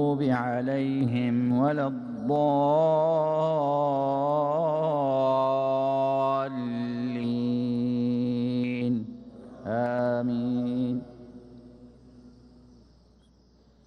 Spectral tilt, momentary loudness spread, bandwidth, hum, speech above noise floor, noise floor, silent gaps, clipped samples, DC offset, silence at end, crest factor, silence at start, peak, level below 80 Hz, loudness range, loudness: -9 dB/octave; 8 LU; 7 kHz; none; 34 dB; -59 dBFS; none; under 0.1%; under 0.1%; 1.55 s; 14 dB; 0 s; -14 dBFS; -64 dBFS; 6 LU; -26 LUFS